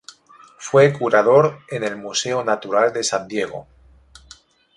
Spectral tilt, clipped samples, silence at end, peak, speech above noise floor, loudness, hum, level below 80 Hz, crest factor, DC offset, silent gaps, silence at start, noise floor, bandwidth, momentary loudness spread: -4 dB/octave; under 0.1%; 1.15 s; -2 dBFS; 31 dB; -18 LUFS; none; -58 dBFS; 18 dB; under 0.1%; none; 0.6 s; -49 dBFS; 11.5 kHz; 12 LU